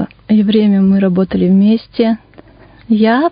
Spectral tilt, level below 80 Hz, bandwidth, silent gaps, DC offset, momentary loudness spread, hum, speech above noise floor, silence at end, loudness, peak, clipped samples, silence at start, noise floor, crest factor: -13 dB/octave; -46 dBFS; 5.2 kHz; none; under 0.1%; 5 LU; none; 30 dB; 0 s; -12 LUFS; 0 dBFS; under 0.1%; 0 s; -40 dBFS; 12 dB